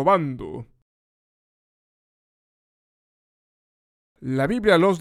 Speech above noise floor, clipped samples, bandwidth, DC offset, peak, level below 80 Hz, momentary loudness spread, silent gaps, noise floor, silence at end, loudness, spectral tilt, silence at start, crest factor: over 70 dB; under 0.1%; 15 kHz; under 0.1%; -4 dBFS; -54 dBFS; 19 LU; 0.82-4.15 s; under -90 dBFS; 0 s; -21 LUFS; -6.5 dB/octave; 0 s; 22 dB